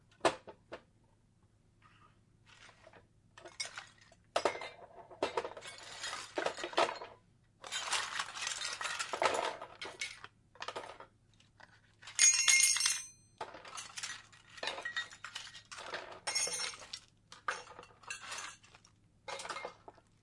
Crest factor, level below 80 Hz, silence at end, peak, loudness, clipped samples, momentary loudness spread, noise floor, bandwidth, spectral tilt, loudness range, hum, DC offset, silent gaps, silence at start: 28 dB; -74 dBFS; 0.3 s; -12 dBFS; -35 LUFS; under 0.1%; 22 LU; -69 dBFS; 11.5 kHz; 0.5 dB/octave; 14 LU; none; under 0.1%; none; 0.25 s